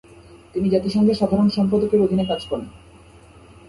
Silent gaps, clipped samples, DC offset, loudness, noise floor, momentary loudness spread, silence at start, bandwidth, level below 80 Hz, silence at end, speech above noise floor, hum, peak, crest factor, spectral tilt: none; under 0.1%; under 0.1%; -20 LUFS; -47 dBFS; 12 LU; 0.3 s; 11.5 kHz; -48 dBFS; 0.9 s; 28 dB; none; -6 dBFS; 16 dB; -8 dB/octave